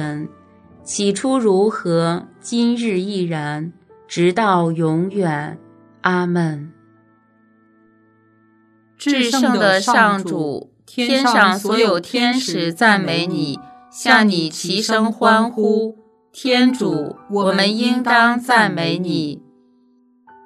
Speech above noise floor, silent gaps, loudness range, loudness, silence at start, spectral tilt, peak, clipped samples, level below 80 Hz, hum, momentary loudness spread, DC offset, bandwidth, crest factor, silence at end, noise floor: 39 dB; none; 7 LU; -17 LUFS; 0 s; -4.5 dB/octave; 0 dBFS; under 0.1%; -68 dBFS; none; 13 LU; under 0.1%; 14 kHz; 18 dB; 1.05 s; -56 dBFS